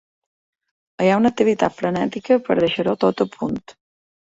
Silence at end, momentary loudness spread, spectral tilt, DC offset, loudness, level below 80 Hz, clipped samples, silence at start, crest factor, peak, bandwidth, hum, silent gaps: 0.65 s; 8 LU; -6.5 dB/octave; under 0.1%; -19 LUFS; -56 dBFS; under 0.1%; 1 s; 18 dB; -2 dBFS; 8 kHz; none; none